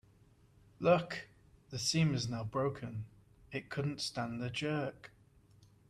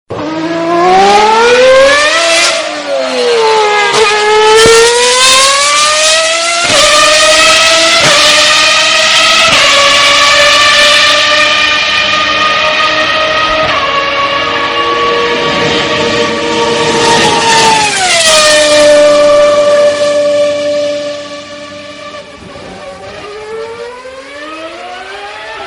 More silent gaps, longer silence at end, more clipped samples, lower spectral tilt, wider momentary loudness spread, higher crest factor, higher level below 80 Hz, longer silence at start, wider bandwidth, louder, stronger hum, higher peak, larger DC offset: neither; first, 0.8 s vs 0 s; second, under 0.1% vs 1%; first, -5 dB/octave vs -1 dB/octave; second, 16 LU vs 19 LU; first, 22 dB vs 8 dB; second, -66 dBFS vs -40 dBFS; first, 0.8 s vs 0.1 s; second, 13.5 kHz vs over 20 kHz; second, -36 LUFS vs -6 LUFS; neither; second, -16 dBFS vs 0 dBFS; neither